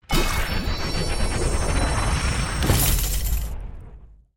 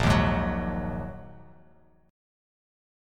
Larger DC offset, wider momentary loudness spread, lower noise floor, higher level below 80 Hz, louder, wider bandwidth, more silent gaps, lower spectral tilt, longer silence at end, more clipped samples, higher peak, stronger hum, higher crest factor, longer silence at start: neither; second, 11 LU vs 21 LU; second, -44 dBFS vs -59 dBFS; first, -26 dBFS vs -38 dBFS; first, -24 LUFS vs -28 LUFS; about the same, 17 kHz vs 15.5 kHz; neither; second, -4 dB/octave vs -6.5 dB/octave; second, 0.3 s vs 1.7 s; neither; first, -6 dBFS vs -10 dBFS; neither; about the same, 18 dB vs 20 dB; about the same, 0.1 s vs 0 s